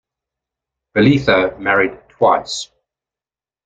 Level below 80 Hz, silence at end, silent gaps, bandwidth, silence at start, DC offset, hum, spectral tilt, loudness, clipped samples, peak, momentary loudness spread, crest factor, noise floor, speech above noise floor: -48 dBFS; 1 s; none; 9.2 kHz; 0.95 s; under 0.1%; none; -5.5 dB/octave; -16 LUFS; under 0.1%; -2 dBFS; 12 LU; 16 dB; under -90 dBFS; over 76 dB